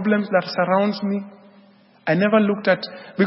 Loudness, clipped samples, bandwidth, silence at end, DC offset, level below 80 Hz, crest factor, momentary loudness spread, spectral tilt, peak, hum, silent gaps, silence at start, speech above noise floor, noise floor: -20 LUFS; under 0.1%; 5.8 kHz; 0 s; under 0.1%; -70 dBFS; 16 dB; 12 LU; -10.5 dB/octave; -4 dBFS; none; none; 0 s; 32 dB; -52 dBFS